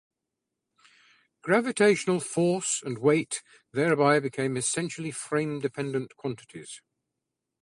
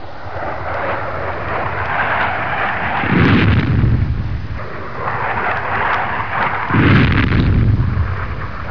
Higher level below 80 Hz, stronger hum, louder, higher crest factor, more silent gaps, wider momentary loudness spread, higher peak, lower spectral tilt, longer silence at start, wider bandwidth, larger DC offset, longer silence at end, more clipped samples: second, -70 dBFS vs -26 dBFS; neither; second, -27 LUFS vs -17 LUFS; about the same, 20 dB vs 16 dB; neither; first, 15 LU vs 12 LU; second, -8 dBFS vs 0 dBFS; second, -4.5 dB/octave vs -8.5 dB/octave; first, 1.45 s vs 0 s; first, 11.5 kHz vs 5.4 kHz; second, under 0.1% vs 4%; first, 0.85 s vs 0 s; neither